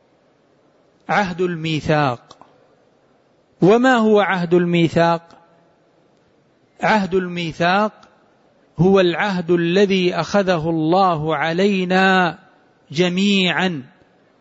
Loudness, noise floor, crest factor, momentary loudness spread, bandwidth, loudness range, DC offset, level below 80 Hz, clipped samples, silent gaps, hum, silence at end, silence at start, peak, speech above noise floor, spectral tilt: -17 LUFS; -57 dBFS; 14 dB; 8 LU; 8 kHz; 5 LU; under 0.1%; -54 dBFS; under 0.1%; none; none; 0.55 s; 1.1 s; -4 dBFS; 41 dB; -6 dB/octave